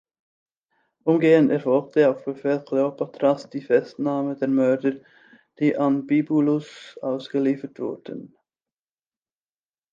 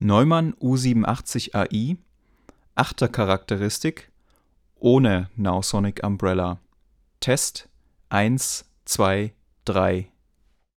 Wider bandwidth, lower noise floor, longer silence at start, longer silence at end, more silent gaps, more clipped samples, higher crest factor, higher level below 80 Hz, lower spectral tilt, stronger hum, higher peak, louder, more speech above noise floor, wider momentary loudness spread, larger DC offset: second, 7.4 kHz vs 17.5 kHz; first, under -90 dBFS vs -64 dBFS; first, 1.05 s vs 0 s; first, 1.65 s vs 0.75 s; neither; neither; about the same, 18 dB vs 18 dB; second, -78 dBFS vs -50 dBFS; first, -8 dB/octave vs -5 dB/octave; neither; about the same, -6 dBFS vs -4 dBFS; about the same, -22 LUFS vs -23 LUFS; first, over 68 dB vs 42 dB; about the same, 13 LU vs 11 LU; neither